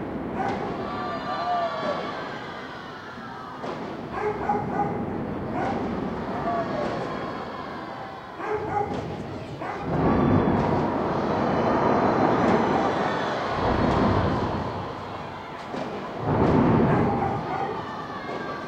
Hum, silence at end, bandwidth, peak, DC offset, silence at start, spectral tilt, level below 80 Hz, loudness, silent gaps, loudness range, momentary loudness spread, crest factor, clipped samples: none; 0 s; 9 kHz; -8 dBFS; under 0.1%; 0 s; -7.5 dB/octave; -44 dBFS; -26 LUFS; none; 8 LU; 13 LU; 18 dB; under 0.1%